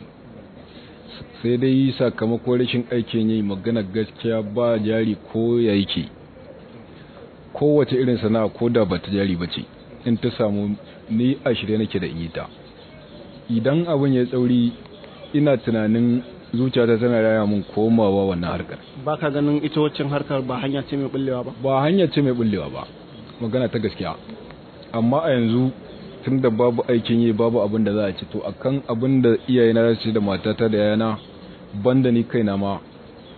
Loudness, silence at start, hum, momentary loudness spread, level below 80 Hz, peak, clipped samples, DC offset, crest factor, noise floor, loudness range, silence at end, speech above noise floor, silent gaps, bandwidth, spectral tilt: -21 LUFS; 0 s; none; 14 LU; -52 dBFS; -6 dBFS; under 0.1%; under 0.1%; 16 dB; -43 dBFS; 4 LU; 0 s; 23 dB; none; 4.5 kHz; -11 dB/octave